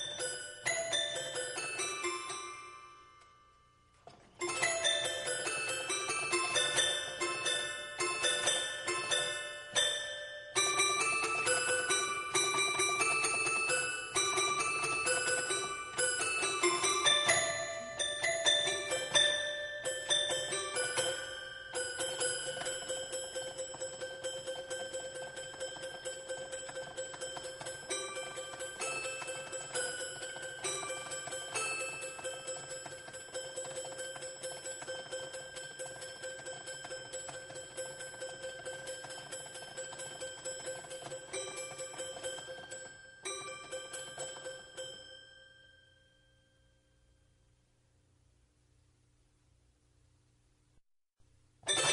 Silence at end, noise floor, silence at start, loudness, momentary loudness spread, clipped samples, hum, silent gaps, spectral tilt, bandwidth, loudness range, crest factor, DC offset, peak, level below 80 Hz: 0 s; -71 dBFS; 0 s; -35 LUFS; 14 LU; under 0.1%; none; none; -0.5 dB/octave; 11.5 kHz; 13 LU; 24 dB; under 0.1%; -14 dBFS; -72 dBFS